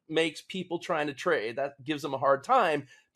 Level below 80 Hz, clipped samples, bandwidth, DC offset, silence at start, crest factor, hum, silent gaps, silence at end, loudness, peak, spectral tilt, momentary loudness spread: -76 dBFS; under 0.1%; 13 kHz; under 0.1%; 0.1 s; 18 dB; none; none; 0.3 s; -29 LUFS; -10 dBFS; -4.5 dB/octave; 11 LU